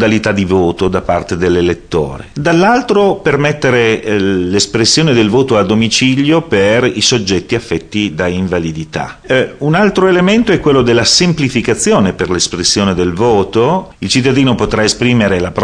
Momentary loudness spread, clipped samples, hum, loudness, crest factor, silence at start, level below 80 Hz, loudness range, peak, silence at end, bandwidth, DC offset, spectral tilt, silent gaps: 7 LU; under 0.1%; none; -11 LUFS; 10 dB; 0 s; -36 dBFS; 3 LU; 0 dBFS; 0 s; 10.5 kHz; under 0.1%; -4.5 dB/octave; none